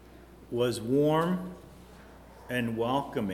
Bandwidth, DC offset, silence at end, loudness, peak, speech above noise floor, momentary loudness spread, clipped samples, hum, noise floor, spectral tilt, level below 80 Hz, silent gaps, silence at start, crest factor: 18 kHz; under 0.1%; 0 s; -29 LUFS; -12 dBFS; 23 dB; 17 LU; under 0.1%; none; -51 dBFS; -6.5 dB/octave; -56 dBFS; none; 0 s; 18 dB